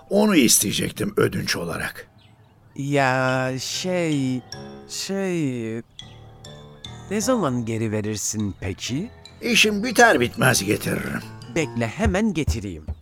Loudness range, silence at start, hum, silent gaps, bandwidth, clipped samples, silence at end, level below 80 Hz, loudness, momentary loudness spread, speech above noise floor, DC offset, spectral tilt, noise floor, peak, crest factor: 7 LU; 0.1 s; none; none; 18.5 kHz; under 0.1%; 0 s; -42 dBFS; -22 LUFS; 20 LU; 30 dB; under 0.1%; -4 dB/octave; -52 dBFS; -2 dBFS; 22 dB